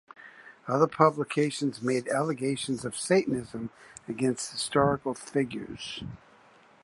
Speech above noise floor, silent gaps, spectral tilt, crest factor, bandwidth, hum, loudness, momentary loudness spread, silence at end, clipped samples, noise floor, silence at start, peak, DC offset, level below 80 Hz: 29 dB; none; -5 dB/octave; 24 dB; 11.5 kHz; none; -28 LUFS; 17 LU; 0.65 s; under 0.1%; -58 dBFS; 0.2 s; -6 dBFS; under 0.1%; -60 dBFS